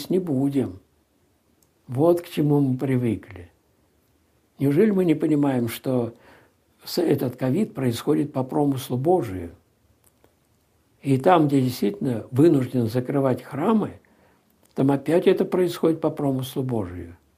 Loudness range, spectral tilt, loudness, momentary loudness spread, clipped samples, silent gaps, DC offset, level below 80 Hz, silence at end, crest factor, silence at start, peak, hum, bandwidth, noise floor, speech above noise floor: 3 LU; -7.5 dB/octave; -23 LUFS; 13 LU; under 0.1%; none; under 0.1%; -64 dBFS; 0.25 s; 20 dB; 0 s; -2 dBFS; none; 15.5 kHz; -64 dBFS; 43 dB